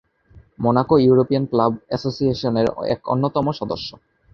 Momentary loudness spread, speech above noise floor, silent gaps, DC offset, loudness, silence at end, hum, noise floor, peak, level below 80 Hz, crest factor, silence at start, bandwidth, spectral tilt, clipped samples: 11 LU; 31 dB; none; under 0.1%; -20 LUFS; 0.45 s; none; -50 dBFS; -2 dBFS; -50 dBFS; 18 dB; 0.35 s; 6.8 kHz; -8.5 dB/octave; under 0.1%